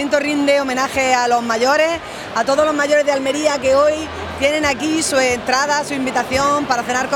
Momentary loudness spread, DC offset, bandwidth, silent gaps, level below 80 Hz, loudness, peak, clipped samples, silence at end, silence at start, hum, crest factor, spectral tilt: 5 LU; under 0.1%; 19 kHz; none; -48 dBFS; -16 LUFS; 0 dBFS; under 0.1%; 0 s; 0 s; none; 16 dB; -3 dB/octave